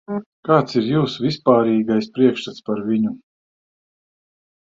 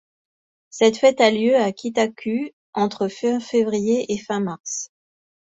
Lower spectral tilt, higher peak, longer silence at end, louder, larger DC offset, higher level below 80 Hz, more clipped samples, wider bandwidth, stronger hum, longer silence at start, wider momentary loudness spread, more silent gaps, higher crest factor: first, -7.5 dB/octave vs -4 dB/octave; about the same, -2 dBFS vs -2 dBFS; first, 1.6 s vs 0.7 s; about the same, -19 LUFS vs -21 LUFS; neither; first, -60 dBFS vs -66 dBFS; neither; about the same, 7.6 kHz vs 8 kHz; neither; second, 0.1 s vs 0.75 s; about the same, 11 LU vs 13 LU; second, 0.26-0.43 s vs 2.53-2.73 s, 4.60-4.64 s; about the same, 18 dB vs 20 dB